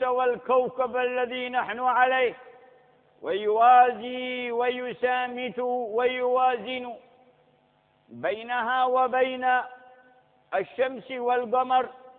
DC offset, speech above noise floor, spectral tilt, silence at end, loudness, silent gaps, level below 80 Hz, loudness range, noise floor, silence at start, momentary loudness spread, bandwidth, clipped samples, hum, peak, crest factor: under 0.1%; 40 dB; -7.5 dB/octave; 0.05 s; -25 LUFS; none; -72 dBFS; 4 LU; -65 dBFS; 0 s; 10 LU; 4.1 kHz; under 0.1%; none; -8 dBFS; 18 dB